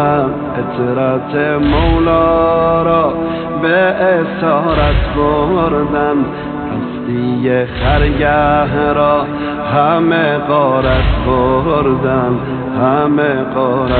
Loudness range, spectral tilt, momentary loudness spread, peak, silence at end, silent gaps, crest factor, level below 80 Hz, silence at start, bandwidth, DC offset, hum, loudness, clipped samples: 2 LU; -11 dB/octave; 7 LU; 0 dBFS; 0 s; none; 12 dB; -24 dBFS; 0 s; 4.6 kHz; under 0.1%; none; -13 LUFS; under 0.1%